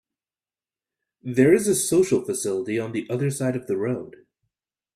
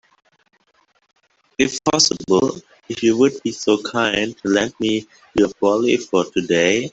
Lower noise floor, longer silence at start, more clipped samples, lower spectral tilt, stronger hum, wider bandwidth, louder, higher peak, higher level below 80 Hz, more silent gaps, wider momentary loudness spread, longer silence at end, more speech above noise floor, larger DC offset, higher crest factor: first, under -90 dBFS vs -62 dBFS; second, 1.25 s vs 1.6 s; neither; first, -5.5 dB/octave vs -3.5 dB/octave; neither; first, 15 kHz vs 8.2 kHz; second, -23 LUFS vs -18 LUFS; second, -6 dBFS vs 0 dBFS; second, -62 dBFS vs -54 dBFS; neither; about the same, 10 LU vs 8 LU; first, 0.85 s vs 0.05 s; first, over 68 dB vs 43 dB; neither; about the same, 20 dB vs 18 dB